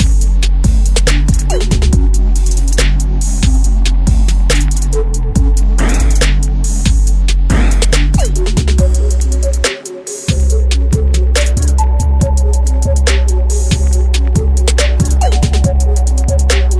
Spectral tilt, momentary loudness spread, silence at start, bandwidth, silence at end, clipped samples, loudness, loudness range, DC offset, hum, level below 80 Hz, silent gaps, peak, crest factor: -5 dB/octave; 3 LU; 0 s; 11 kHz; 0 s; under 0.1%; -13 LUFS; 1 LU; under 0.1%; none; -10 dBFS; none; 0 dBFS; 10 dB